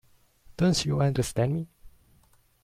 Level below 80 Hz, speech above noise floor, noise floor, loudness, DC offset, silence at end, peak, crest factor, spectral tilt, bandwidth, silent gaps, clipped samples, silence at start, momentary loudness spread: -50 dBFS; 37 dB; -62 dBFS; -27 LUFS; under 0.1%; 0.75 s; -12 dBFS; 18 dB; -5.5 dB/octave; 15.5 kHz; none; under 0.1%; 0.6 s; 8 LU